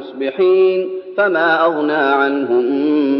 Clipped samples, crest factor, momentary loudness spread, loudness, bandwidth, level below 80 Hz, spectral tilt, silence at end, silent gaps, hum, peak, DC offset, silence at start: under 0.1%; 12 dB; 6 LU; -15 LUFS; 5.6 kHz; -72 dBFS; -2.5 dB/octave; 0 s; none; none; -2 dBFS; under 0.1%; 0 s